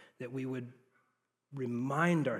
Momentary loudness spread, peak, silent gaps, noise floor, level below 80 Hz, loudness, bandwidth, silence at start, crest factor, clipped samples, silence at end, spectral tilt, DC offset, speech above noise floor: 17 LU; -16 dBFS; none; -80 dBFS; -90 dBFS; -36 LUFS; 13 kHz; 0 s; 20 dB; under 0.1%; 0 s; -7 dB/octave; under 0.1%; 46 dB